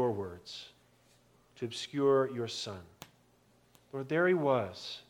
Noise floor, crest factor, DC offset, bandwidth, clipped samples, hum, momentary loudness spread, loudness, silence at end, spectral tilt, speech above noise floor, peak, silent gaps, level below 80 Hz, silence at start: -67 dBFS; 18 dB; under 0.1%; 17.5 kHz; under 0.1%; 60 Hz at -65 dBFS; 22 LU; -33 LUFS; 0.1 s; -5.5 dB/octave; 34 dB; -16 dBFS; none; -74 dBFS; 0 s